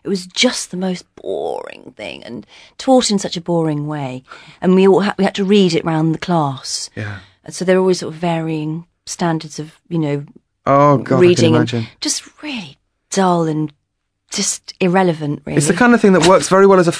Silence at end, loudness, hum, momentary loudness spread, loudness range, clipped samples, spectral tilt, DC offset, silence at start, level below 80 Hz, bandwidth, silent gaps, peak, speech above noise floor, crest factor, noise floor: 0 s; -15 LUFS; none; 17 LU; 5 LU; under 0.1%; -5 dB/octave; under 0.1%; 0.05 s; -52 dBFS; 11 kHz; none; 0 dBFS; 56 dB; 16 dB; -72 dBFS